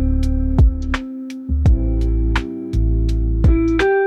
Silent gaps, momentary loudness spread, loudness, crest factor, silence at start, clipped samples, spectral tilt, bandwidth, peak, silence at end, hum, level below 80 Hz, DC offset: none; 8 LU; -19 LUFS; 12 dB; 0 s; under 0.1%; -8 dB/octave; 7.6 kHz; -4 dBFS; 0 s; none; -18 dBFS; under 0.1%